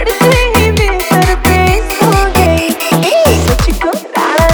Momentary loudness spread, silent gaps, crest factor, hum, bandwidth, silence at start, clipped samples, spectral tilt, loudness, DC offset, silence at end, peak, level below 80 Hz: 4 LU; none; 10 dB; none; over 20 kHz; 0 s; under 0.1%; -5 dB/octave; -10 LUFS; under 0.1%; 0 s; 0 dBFS; -18 dBFS